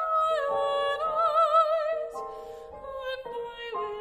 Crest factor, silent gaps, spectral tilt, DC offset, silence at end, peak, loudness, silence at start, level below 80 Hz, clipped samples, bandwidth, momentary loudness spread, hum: 16 dB; none; -2.5 dB/octave; under 0.1%; 0 s; -12 dBFS; -27 LUFS; 0 s; -60 dBFS; under 0.1%; 14 kHz; 18 LU; none